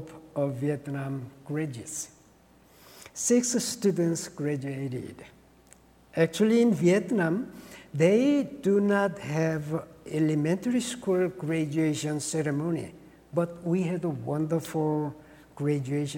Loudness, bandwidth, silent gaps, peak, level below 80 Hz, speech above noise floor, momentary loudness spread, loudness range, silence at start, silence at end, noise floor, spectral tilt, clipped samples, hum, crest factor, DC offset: -28 LUFS; 18 kHz; none; -10 dBFS; -64 dBFS; 31 dB; 12 LU; 5 LU; 0 s; 0 s; -58 dBFS; -5.5 dB/octave; under 0.1%; none; 18 dB; under 0.1%